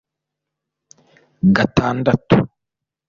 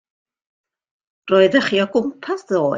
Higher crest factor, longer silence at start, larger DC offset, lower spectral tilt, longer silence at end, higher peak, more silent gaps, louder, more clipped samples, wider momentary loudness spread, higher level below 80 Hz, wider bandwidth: about the same, 18 dB vs 18 dB; first, 1.45 s vs 1.25 s; neither; first, -7.5 dB/octave vs -5.5 dB/octave; first, 0.65 s vs 0 s; about the same, -2 dBFS vs -2 dBFS; neither; about the same, -17 LUFS vs -18 LUFS; neither; second, 4 LU vs 10 LU; first, -44 dBFS vs -64 dBFS; about the same, 7.2 kHz vs 7.6 kHz